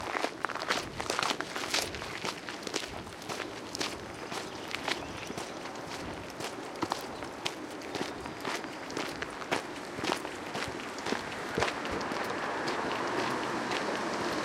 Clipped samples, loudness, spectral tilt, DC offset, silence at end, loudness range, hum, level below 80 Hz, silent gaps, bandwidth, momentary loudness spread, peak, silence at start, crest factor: under 0.1%; -35 LUFS; -3 dB/octave; under 0.1%; 0 s; 4 LU; none; -60 dBFS; none; 16.5 kHz; 7 LU; -10 dBFS; 0 s; 26 dB